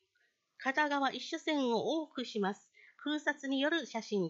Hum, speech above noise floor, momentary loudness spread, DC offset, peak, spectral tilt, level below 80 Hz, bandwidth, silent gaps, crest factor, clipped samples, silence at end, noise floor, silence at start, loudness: none; 43 dB; 7 LU; under 0.1%; -18 dBFS; -4.5 dB/octave; under -90 dBFS; 8 kHz; none; 18 dB; under 0.1%; 0 s; -78 dBFS; 0.6 s; -35 LUFS